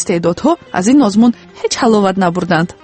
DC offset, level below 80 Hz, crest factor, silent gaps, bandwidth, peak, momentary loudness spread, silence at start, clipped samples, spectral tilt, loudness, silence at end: under 0.1%; -48 dBFS; 12 dB; none; 8.8 kHz; 0 dBFS; 5 LU; 0 s; under 0.1%; -5.5 dB/octave; -13 LUFS; 0.1 s